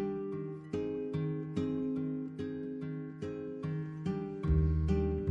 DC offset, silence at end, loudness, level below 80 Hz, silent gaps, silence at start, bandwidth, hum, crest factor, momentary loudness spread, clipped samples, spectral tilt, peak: under 0.1%; 0 s; -36 LUFS; -42 dBFS; none; 0 s; 7.6 kHz; none; 16 dB; 10 LU; under 0.1%; -9.5 dB/octave; -18 dBFS